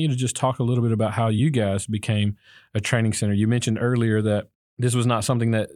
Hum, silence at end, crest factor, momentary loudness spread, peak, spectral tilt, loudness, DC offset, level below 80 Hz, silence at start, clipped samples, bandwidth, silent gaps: none; 0.1 s; 18 dB; 6 LU; -4 dBFS; -6 dB/octave; -23 LUFS; under 0.1%; -60 dBFS; 0 s; under 0.1%; 13 kHz; 4.55-4.77 s